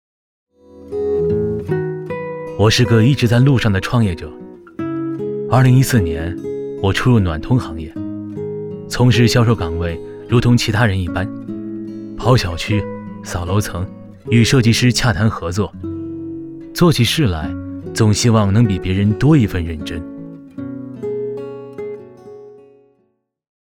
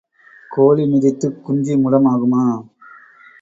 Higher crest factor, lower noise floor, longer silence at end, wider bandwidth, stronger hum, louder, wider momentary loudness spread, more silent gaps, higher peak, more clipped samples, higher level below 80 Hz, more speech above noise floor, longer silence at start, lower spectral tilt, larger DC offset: about the same, 16 dB vs 16 dB; first, -64 dBFS vs -44 dBFS; first, 1.15 s vs 0.8 s; first, 16 kHz vs 7.8 kHz; neither; about the same, -17 LUFS vs -16 LUFS; first, 16 LU vs 9 LU; neither; about the same, -2 dBFS vs -2 dBFS; neither; first, -36 dBFS vs -60 dBFS; first, 50 dB vs 29 dB; first, 0.75 s vs 0.5 s; second, -6 dB/octave vs -9 dB/octave; neither